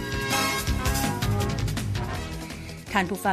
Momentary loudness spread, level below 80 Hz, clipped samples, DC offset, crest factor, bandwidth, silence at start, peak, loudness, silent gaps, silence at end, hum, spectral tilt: 11 LU; -36 dBFS; under 0.1%; under 0.1%; 20 dB; 15 kHz; 0 s; -6 dBFS; -27 LUFS; none; 0 s; none; -4 dB/octave